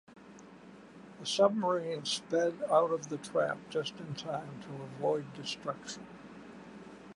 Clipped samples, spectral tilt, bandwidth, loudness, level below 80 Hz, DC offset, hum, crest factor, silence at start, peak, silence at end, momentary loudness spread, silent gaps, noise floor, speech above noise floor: under 0.1%; -4 dB/octave; 11.5 kHz; -33 LUFS; -74 dBFS; under 0.1%; none; 22 dB; 0.1 s; -12 dBFS; 0 s; 24 LU; none; -53 dBFS; 20 dB